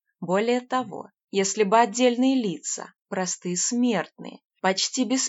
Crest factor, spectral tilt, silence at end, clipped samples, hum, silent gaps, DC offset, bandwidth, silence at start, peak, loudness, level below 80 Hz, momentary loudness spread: 20 dB; -3.5 dB/octave; 0 s; under 0.1%; none; 4.45-4.50 s; under 0.1%; 8 kHz; 0.2 s; -6 dBFS; -24 LUFS; under -90 dBFS; 14 LU